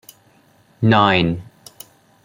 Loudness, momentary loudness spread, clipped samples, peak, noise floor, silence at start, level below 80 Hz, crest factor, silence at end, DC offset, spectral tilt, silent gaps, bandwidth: -16 LUFS; 26 LU; under 0.1%; -2 dBFS; -54 dBFS; 0.8 s; -50 dBFS; 20 dB; 0.8 s; under 0.1%; -6.5 dB/octave; none; 16.5 kHz